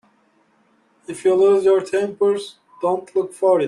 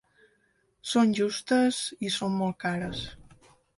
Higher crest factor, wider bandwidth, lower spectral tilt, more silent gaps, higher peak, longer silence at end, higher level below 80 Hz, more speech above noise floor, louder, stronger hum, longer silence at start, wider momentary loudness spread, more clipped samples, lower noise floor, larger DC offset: about the same, 14 dB vs 18 dB; about the same, 11.5 kHz vs 11.5 kHz; about the same, -5.5 dB/octave vs -4.5 dB/octave; neither; first, -4 dBFS vs -10 dBFS; second, 0 s vs 0.55 s; second, -68 dBFS vs -58 dBFS; about the same, 42 dB vs 43 dB; first, -19 LUFS vs -27 LUFS; neither; first, 1.1 s vs 0.85 s; about the same, 11 LU vs 12 LU; neither; second, -60 dBFS vs -70 dBFS; neither